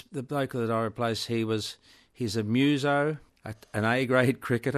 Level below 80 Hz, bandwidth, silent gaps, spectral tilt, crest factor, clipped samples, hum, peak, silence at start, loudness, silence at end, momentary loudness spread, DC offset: -66 dBFS; 13.5 kHz; none; -6 dB/octave; 20 dB; under 0.1%; none; -8 dBFS; 0.1 s; -28 LUFS; 0 s; 13 LU; under 0.1%